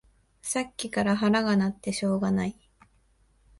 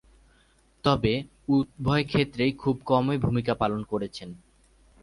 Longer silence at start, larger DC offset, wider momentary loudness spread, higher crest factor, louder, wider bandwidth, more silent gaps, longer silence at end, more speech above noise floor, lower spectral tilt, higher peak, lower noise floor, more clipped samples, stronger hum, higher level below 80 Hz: second, 0.45 s vs 0.85 s; neither; about the same, 8 LU vs 8 LU; about the same, 18 dB vs 20 dB; about the same, -27 LUFS vs -26 LUFS; about the same, 11.5 kHz vs 11.5 kHz; neither; first, 1.1 s vs 0.65 s; about the same, 38 dB vs 37 dB; second, -5 dB/octave vs -7.5 dB/octave; second, -12 dBFS vs -6 dBFS; about the same, -64 dBFS vs -62 dBFS; neither; neither; second, -58 dBFS vs -48 dBFS